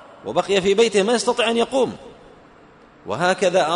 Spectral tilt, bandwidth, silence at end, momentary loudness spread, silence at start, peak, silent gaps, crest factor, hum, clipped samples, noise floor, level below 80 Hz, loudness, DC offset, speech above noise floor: -3.5 dB/octave; 11 kHz; 0 s; 10 LU; 0 s; -6 dBFS; none; 14 dB; none; under 0.1%; -48 dBFS; -56 dBFS; -19 LUFS; under 0.1%; 30 dB